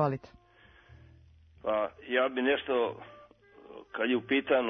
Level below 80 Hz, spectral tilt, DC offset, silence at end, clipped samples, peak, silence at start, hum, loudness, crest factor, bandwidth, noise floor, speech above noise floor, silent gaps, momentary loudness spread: -66 dBFS; -8 dB/octave; under 0.1%; 0 s; under 0.1%; -14 dBFS; 0 s; none; -30 LUFS; 18 dB; 6 kHz; -59 dBFS; 30 dB; none; 20 LU